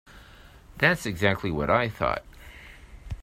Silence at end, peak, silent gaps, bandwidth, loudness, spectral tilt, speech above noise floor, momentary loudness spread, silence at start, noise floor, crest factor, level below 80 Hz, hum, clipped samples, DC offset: 0 s; -6 dBFS; none; 16 kHz; -25 LUFS; -5.5 dB/octave; 25 dB; 23 LU; 0.1 s; -50 dBFS; 24 dB; -46 dBFS; none; under 0.1%; under 0.1%